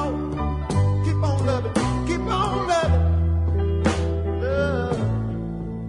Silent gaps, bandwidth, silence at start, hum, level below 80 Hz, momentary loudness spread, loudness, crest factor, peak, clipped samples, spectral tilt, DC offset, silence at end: none; 10.5 kHz; 0 s; none; -32 dBFS; 6 LU; -23 LUFS; 14 dB; -8 dBFS; under 0.1%; -7 dB/octave; under 0.1%; 0 s